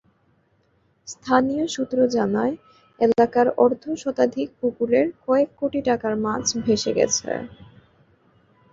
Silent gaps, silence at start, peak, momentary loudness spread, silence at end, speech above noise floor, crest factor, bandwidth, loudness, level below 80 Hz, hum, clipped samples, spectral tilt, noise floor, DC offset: none; 1.05 s; -2 dBFS; 10 LU; 1.1 s; 43 dB; 20 dB; 7.8 kHz; -22 LUFS; -58 dBFS; none; under 0.1%; -4 dB/octave; -64 dBFS; under 0.1%